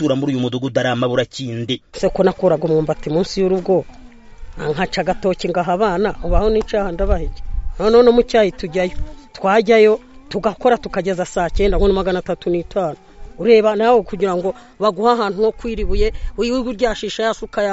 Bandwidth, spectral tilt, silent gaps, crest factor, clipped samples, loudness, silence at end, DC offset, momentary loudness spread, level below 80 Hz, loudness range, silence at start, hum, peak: 8 kHz; -4.5 dB/octave; none; 16 dB; under 0.1%; -17 LUFS; 0 s; under 0.1%; 11 LU; -28 dBFS; 4 LU; 0 s; none; 0 dBFS